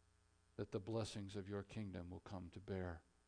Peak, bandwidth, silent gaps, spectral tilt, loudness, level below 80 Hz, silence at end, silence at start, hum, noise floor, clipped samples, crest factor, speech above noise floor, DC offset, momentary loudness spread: -32 dBFS; 10 kHz; none; -6.5 dB/octave; -50 LUFS; -70 dBFS; 0.25 s; 0.6 s; none; -76 dBFS; under 0.1%; 18 dB; 27 dB; under 0.1%; 8 LU